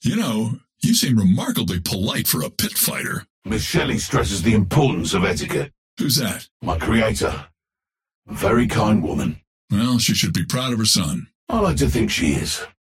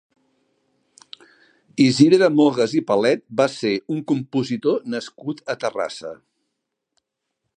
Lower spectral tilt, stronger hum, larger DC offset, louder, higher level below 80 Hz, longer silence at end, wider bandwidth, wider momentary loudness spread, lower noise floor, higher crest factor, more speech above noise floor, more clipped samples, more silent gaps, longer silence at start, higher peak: second, -4.5 dB/octave vs -6 dB/octave; neither; neither; about the same, -20 LUFS vs -20 LUFS; first, -36 dBFS vs -70 dBFS; second, 0.3 s vs 1.45 s; first, 16.5 kHz vs 9.8 kHz; second, 10 LU vs 16 LU; first, -89 dBFS vs -79 dBFS; about the same, 18 dB vs 20 dB; first, 70 dB vs 59 dB; neither; first, 3.30-3.42 s, 5.78-5.97 s, 6.51-6.60 s, 8.15-8.22 s, 9.47-9.68 s, 11.35-11.47 s vs none; second, 0 s vs 1.75 s; about the same, -4 dBFS vs -2 dBFS